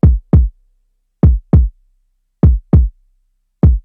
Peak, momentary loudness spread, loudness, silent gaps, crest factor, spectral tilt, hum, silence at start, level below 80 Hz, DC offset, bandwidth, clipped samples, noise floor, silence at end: 0 dBFS; 9 LU; -14 LUFS; none; 12 dB; -13 dB/octave; 60 Hz at -25 dBFS; 0.05 s; -16 dBFS; under 0.1%; 2.3 kHz; under 0.1%; -61 dBFS; 0.05 s